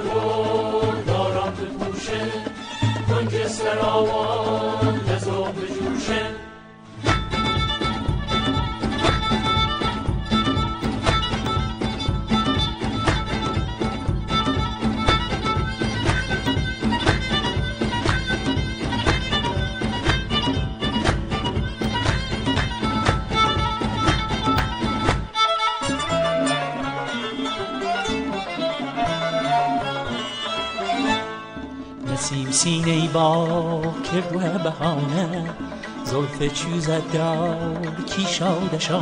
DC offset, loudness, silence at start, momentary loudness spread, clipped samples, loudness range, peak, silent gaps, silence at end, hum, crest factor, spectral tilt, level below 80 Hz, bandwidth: under 0.1%; -23 LUFS; 0 s; 6 LU; under 0.1%; 3 LU; -2 dBFS; none; 0 s; none; 20 dB; -5 dB/octave; -34 dBFS; 10 kHz